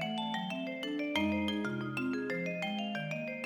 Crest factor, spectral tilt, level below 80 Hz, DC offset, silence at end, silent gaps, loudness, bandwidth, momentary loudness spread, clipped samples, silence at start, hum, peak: 18 dB; -5.5 dB/octave; -66 dBFS; under 0.1%; 0 s; none; -35 LUFS; 19.5 kHz; 5 LU; under 0.1%; 0 s; none; -18 dBFS